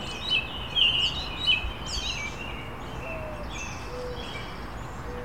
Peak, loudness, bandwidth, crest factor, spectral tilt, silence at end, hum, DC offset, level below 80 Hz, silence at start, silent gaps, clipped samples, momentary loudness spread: -10 dBFS; -28 LUFS; 16.5 kHz; 20 dB; -2.5 dB/octave; 0 s; none; 0.6%; -42 dBFS; 0 s; none; under 0.1%; 16 LU